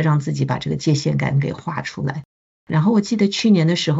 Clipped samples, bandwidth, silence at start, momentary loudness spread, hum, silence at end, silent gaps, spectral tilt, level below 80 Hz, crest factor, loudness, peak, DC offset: under 0.1%; 8 kHz; 0 s; 11 LU; none; 0 s; 2.25-2.67 s; -6 dB/octave; -54 dBFS; 14 dB; -19 LUFS; -4 dBFS; under 0.1%